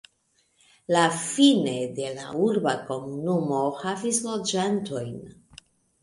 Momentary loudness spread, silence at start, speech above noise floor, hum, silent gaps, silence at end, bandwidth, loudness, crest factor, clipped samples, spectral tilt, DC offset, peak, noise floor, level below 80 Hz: 13 LU; 0.9 s; 44 dB; none; none; 0.7 s; 11.5 kHz; -25 LUFS; 20 dB; under 0.1%; -4 dB/octave; under 0.1%; -6 dBFS; -69 dBFS; -66 dBFS